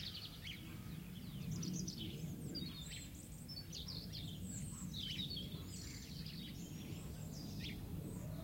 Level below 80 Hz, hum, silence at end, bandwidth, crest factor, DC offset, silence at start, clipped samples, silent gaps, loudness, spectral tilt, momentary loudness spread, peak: -60 dBFS; none; 0 s; 16.5 kHz; 16 dB; under 0.1%; 0 s; under 0.1%; none; -47 LUFS; -4 dB/octave; 6 LU; -32 dBFS